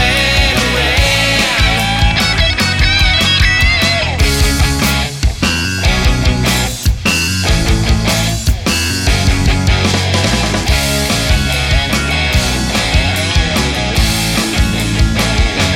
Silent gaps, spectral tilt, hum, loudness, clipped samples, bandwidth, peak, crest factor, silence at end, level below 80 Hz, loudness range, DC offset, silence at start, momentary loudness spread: none; -3.5 dB/octave; none; -12 LUFS; under 0.1%; 16.5 kHz; 0 dBFS; 12 dB; 0 s; -18 dBFS; 3 LU; under 0.1%; 0 s; 4 LU